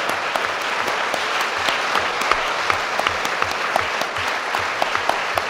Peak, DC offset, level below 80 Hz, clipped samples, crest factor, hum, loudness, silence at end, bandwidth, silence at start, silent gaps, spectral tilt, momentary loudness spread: 0 dBFS; under 0.1%; -52 dBFS; under 0.1%; 20 dB; none; -20 LUFS; 0 s; 16 kHz; 0 s; none; -1.5 dB/octave; 2 LU